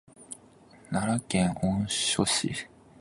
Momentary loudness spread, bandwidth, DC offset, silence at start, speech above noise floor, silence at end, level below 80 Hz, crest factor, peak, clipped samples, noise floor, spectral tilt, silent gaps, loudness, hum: 19 LU; 11.5 kHz; under 0.1%; 0.2 s; 27 dB; 0.35 s; -54 dBFS; 20 dB; -10 dBFS; under 0.1%; -55 dBFS; -4 dB/octave; none; -28 LUFS; none